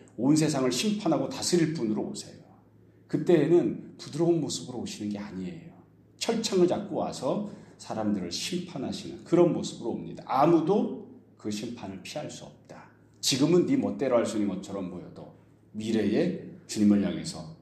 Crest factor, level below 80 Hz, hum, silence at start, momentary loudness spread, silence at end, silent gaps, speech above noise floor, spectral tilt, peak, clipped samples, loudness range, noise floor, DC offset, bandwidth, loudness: 20 dB; -66 dBFS; none; 0.2 s; 16 LU; 0.05 s; none; 30 dB; -5.5 dB/octave; -10 dBFS; under 0.1%; 3 LU; -57 dBFS; under 0.1%; 13.5 kHz; -28 LUFS